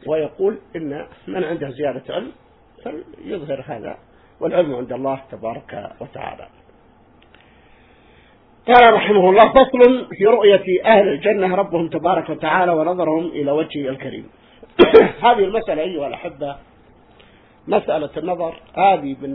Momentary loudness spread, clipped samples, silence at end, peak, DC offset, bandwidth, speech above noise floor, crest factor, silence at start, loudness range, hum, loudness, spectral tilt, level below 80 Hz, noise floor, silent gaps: 21 LU; under 0.1%; 0 s; 0 dBFS; under 0.1%; 5.4 kHz; 34 dB; 18 dB; 0.05 s; 15 LU; none; -16 LUFS; -8.5 dB/octave; -50 dBFS; -51 dBFS; none